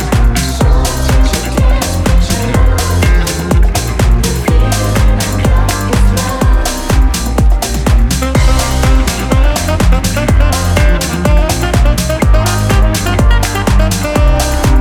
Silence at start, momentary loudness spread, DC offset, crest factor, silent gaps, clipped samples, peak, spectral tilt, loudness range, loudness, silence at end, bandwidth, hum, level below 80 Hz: 0 s; 2 LU; under 0.1%; 10 dB; none; under 0.1%; 0 dBFS; -5 dB/octave; 1 LU; -12 LUFS; 0 s; 17.5 kHz; none; -12 dBFS